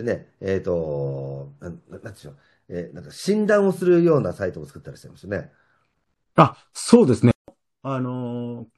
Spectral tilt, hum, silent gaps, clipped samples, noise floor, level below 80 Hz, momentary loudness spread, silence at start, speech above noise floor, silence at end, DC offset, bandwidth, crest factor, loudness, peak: -7 dB/octave; none; 7.35-7.45 s; under 0.1%; -73 dBFS; -56 dBFS; 22 LU; 0 s; 51 dB; 0.15 s; under 0.1%; 12.5 kHz; 22 dB; -21 LUFS; 0 dBFS